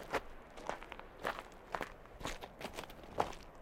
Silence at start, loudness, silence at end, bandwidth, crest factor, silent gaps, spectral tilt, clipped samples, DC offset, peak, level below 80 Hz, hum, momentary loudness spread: 0 s; -45 LUFS; 0 s; 16.5 kHz; 30 dB; none; -3.5 dB/octave; under 0.1%; under 0.1%; -14 dBFS; -56 dBFS; none; 8 LU